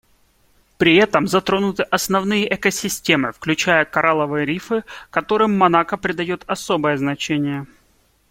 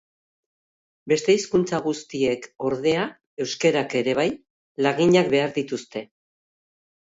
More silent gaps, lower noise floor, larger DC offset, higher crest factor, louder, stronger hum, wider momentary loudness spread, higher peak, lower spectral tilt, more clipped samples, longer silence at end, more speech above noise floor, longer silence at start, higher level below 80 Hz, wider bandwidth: second, none vs 3.27-3.37 s, 4.50-4.75 s; second, -59 dBFS vs under -90 dBFS; neither; about the same, 18 dB vs 18 dB; first, -18 LUFS vs -23 LUFS; neither; second, 10 LU vs 13 LU; first, -2 dBFS vs -6 dBFS; about the same, -4.5 dB/octave vs -5 dB/octave; neither; second, 0.65 s vs 1.15 s; second, 40 dB vs over 68 dB; second, 0.8 s vs 1.05 s; first, -52 dBFS vs -62 dBFS; first, 16.5 kHz vs 8 kHz